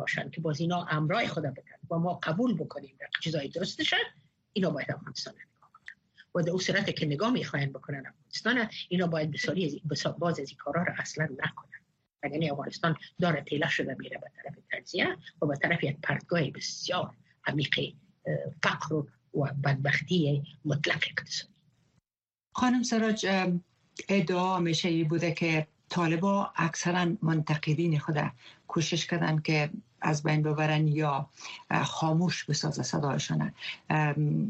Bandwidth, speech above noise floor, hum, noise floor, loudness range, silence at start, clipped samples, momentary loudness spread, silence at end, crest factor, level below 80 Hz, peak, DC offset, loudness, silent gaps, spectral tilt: 8.4 kHz; over 60 dB; none; under -90 dBFS; 4 LU; 0 s; under 0.1%; 10 LU; 0 s; 22 dB; -68 dBFS; -8 dBFS; under 0.1%; -30 LUFS; none; -5 dB/octave